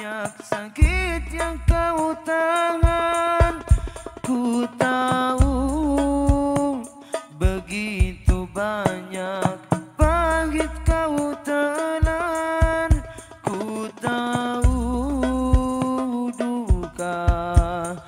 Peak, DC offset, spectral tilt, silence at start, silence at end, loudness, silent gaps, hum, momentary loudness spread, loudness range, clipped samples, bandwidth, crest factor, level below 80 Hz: 0 dBFS; under 0.1%; -6 dB/octave; 0 s; 0 s; -23 LUFS; none; none; 8 LU; 2 LU; under 0.1%; 15 kHz; 20 dB; -26 dBFS